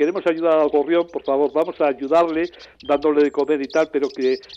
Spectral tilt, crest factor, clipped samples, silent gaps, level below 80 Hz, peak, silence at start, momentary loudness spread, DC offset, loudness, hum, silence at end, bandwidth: -5.5 dB/octave; 12 dB; under 0.1%; none; -60 dBFS; -8 dBFS; 0 s; 5 LU; under 0.1%; -20 LUFS; none; 0 s; 8 kHz